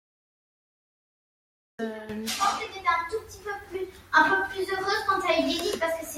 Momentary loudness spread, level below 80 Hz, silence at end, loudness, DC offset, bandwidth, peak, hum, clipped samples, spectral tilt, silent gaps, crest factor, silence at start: 14 LU; -60 dBFS; 0 s; -27 LUFS; under 0.1%; 16.5 kHz; -6 dBFS; none; under 0.1%; -2.5 dB/octave; none; 22 dB; 1.8 s